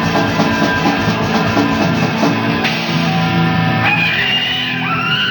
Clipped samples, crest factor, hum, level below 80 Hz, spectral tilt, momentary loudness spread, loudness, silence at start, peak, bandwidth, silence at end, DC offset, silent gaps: under 0.1%; 14 dB; none; -42 dBFS; -5.5 dB/octave; 3 LU; -14 LUFS; 0 s; 0 dBFS; 19.5 kHz; 0 s; under 0.1%; none